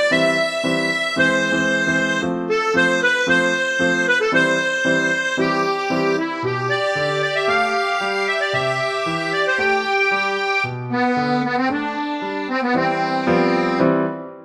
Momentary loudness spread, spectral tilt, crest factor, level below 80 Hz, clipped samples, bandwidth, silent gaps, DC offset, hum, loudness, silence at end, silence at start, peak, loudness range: 5 LU; -4.5 dB/octave; 16 dB; -58 dBFS; under 0.1%; 12.5 kHz; none; under 0.1%; none; -19 LUFS; 0 s; 0 s; -4 dBFS; 3 LU